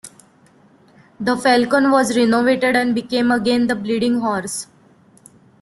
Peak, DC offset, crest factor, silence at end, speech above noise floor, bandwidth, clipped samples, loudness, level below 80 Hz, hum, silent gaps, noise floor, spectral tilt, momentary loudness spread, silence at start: -2 dBFS; under 0.1%; 16 dB; 0.95 s; 35 dB; 12.5 kHz; under 0.1%; -17 LUFS; -58 dBFS; none; none; -52 dBFS; -4 dB/octave; 9 LU; 0.05 s